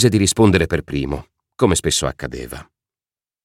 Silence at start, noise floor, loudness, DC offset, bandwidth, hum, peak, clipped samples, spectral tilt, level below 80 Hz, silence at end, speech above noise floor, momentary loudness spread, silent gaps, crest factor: 0 s; under -90 dBFS; -18 LUFS; under 0.1%; 16.5 kHz; none; -2 dBFS; under 0.1%; -4.5 dB/octave; -36 dBFS; 0.8 s; over 73 dB; 16 LU; none; 16 dB